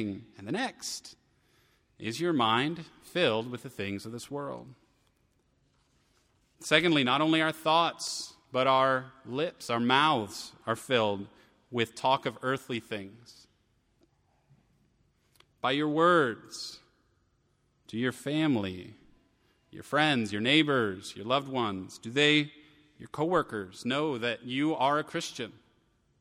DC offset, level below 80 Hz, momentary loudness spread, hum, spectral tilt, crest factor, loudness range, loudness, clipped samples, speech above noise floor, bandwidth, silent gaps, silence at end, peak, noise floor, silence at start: under 0.1%; -72 dBFS; 16 LU; none; -4.5 dB/octave; 24 dB; 8 LU; -29 LUFS; under 0.1%; 42 dB; 16 kHz; none; 0.7 s; -6 dBFS; -72 dBFS; 0 s